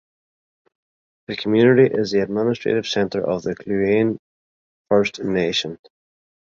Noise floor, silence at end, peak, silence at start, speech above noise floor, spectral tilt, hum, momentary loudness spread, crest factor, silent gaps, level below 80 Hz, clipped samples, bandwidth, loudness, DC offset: under -90 dBFS; 0.85 s; -2 dBFS; 1.3 s; over 71 dB; -6 dB/octave; none; 12 LU; 18 dB; 4.19-4.85 s; -56 dBFS; under 0.1%; 7.6 kHz; -20 LUFS; under 0.1%